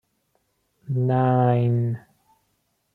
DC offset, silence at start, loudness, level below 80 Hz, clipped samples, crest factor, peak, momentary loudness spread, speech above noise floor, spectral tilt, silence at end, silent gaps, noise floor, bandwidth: under 0.1%; 0.9 s; -22 LUFS; -64 dBFS; under 0.1%; 16 dB; -10 dBFS; 10 LU; 51 dB; -11 dB/octave; 0.95 s; none; -71 dBFS; 4 kHz